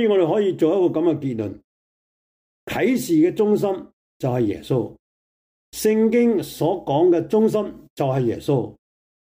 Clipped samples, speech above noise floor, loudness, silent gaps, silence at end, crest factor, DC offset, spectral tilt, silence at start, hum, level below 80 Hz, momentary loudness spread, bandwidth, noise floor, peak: under 0.1%; over 71 dB; -20 LUFS; 1.64-2.67 s, 3.93-4.20 s, 4.99-5.72 s, 7.90-7.97 s; 0.5 s; 14 dB; under 0.1%; -7 dB/octave; 0 s; none; -58 dBFS; 11 LU; 16 kHz; under -90 dBFS; -8 dBFS